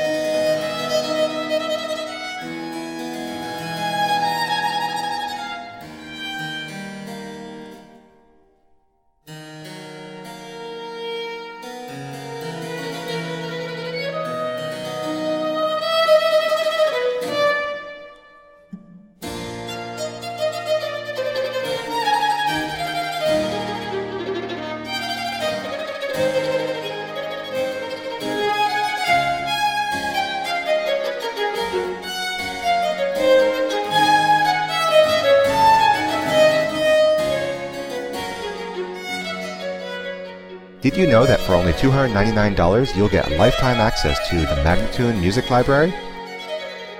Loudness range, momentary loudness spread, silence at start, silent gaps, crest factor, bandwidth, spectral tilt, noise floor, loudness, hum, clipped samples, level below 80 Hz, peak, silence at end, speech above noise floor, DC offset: 15 LU; 17 LU; 0 s; none; 18 dB; 16.5 kHz; -5 dB/octave; -62 dBFS; -21 LUFS; none; under 0.1%; -38 dBFS; -2 dBFS; 0 s; 45 dB; under 0.1%